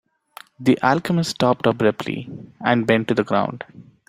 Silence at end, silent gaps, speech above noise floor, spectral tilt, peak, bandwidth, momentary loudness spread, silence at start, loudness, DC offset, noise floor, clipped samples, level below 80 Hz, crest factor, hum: 0.25 s; none; 26 dB; -6 dB/octave; -2 dBFS; 15.5 kHz; 12 LU; 0.6 s; -20 LUFS; under 0.1%; -46 dBFS; under 0.1%; -58 dBFS; 20 dB; none